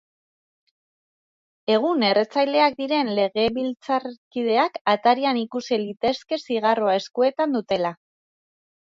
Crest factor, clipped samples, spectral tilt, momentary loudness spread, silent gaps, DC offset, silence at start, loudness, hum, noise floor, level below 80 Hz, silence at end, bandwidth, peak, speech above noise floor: 18 dB; under 0.1%; -5 dB/octave; 7 LU; 4.18-4.31 s, 4.81-4.85 s; under 0.1%; 1.7 s; -22 LUFS; none; under -90 dBFS; -64 dBFS; 0.9 s; 7.6 kHz; -6 dBFS; over 68 dB